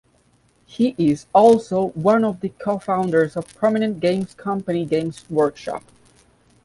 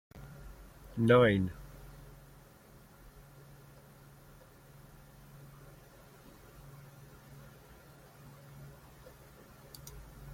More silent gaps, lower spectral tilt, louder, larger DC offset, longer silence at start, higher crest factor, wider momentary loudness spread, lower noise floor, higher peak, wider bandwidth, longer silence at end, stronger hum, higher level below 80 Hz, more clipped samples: neither; about the same, -7 dB/octave vs -7 dB/octave; first, -20 LUFS vs -28 LUFS; neither; first, 0.75 s vs 0.2 s; second, 18 dB vs 26 dB; second, 11 LU vs 24 LU; about the same, -59 dBFS vs -58 dBFS; first, -2 dBFS vs -12 dBFS; second, 11.5 kHz vs 16.5 kHz; first, 0.85 s vs 0 s; neither; about the same, -58 dBFS vs -58 dBFS; neither